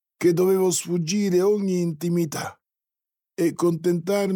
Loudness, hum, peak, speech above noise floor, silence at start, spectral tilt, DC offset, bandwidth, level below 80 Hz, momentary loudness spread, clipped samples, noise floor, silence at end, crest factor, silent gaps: -23 LUFS; none; -10 dBFS; 68 dB; 0.2 s; -5.5 dB/octave; under 0.1%; 18 kHz; -70 dBFS; 8 LU; under 0.1%; -89 dBFS; 0 s; 14 dB; none